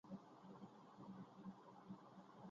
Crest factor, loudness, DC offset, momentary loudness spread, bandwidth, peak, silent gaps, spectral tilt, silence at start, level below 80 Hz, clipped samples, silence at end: 16 dB; -60 LUFS; under 0.1%; 4 LU; 7.2 kHz; -44 dBFS; none; -7 dB/octave; 0.05 s; under -90 dBFS; under 0.1%; 0 s